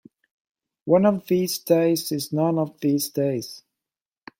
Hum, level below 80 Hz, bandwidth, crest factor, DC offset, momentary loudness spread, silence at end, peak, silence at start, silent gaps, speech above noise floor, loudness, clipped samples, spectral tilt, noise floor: none; -66 dBFS; 16.5 kHz; 18 dB; under 0.1%; 8 LU; 0.8 s; -4 dBFS; 0.85 s; none; 68 dB; -22 LUFS; under 0.1%; -5.5 dB/octave; -90 dBFS